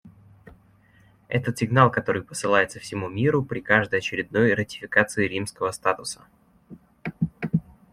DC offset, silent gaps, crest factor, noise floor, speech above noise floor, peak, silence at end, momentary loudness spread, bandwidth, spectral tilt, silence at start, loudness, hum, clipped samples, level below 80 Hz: under 0.1%; none; 22 dB; -57 dBFS; 34 dB; -2 dBFS; 0.3 s; 11 LU; 14.5 kHz; -5.5 dB/octave; 0.05 s; -24 LUFS; none; under 0.1%; -58 dBFS